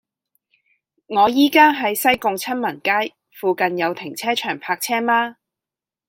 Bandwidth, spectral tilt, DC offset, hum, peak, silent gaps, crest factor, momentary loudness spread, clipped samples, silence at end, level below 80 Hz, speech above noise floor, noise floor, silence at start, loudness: 16.5 kHz; -3 dB/octave; under 0.1%; none; -2 dBFS; none; 18 dB; 10 LU; under 0.1%; 0.75 s; -64 dBFS; 70 dB; -89 dBFS; 1.1 s; -19 LUFS